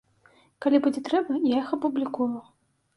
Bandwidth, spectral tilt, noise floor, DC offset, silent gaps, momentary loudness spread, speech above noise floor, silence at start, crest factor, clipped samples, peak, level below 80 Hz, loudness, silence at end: 11.5 kHz; -6 dB/octave; -60 dBFS; under 0.1%; none; 7 LU; 36 dB; 0.6 s; 18 dB; under 0.1%; -8 dBFS; -70 dBFS; -26 LUFS; 0.55 s